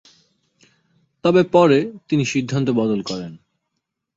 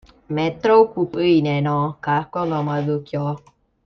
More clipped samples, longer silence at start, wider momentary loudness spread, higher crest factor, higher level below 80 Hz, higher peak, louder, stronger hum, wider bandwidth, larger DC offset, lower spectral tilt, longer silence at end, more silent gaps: neither; first, 1.25 s vs 0.3 s; first, 13 LU vs 10 LU; about the same, 18 dB vs 16 dB; about the same, -60 dBFS vs -56 dBFS; about the same, -2 dBFS vs -2 dBFS; about the same, -18 LUFS vs -20 LUFS; neither; first, 7.8 kHz vs 6.4 kHz; neither; second, -6.5 dB/octave vs -8.5 dB/octave; first, 0.8 s vs 0.5 s; neither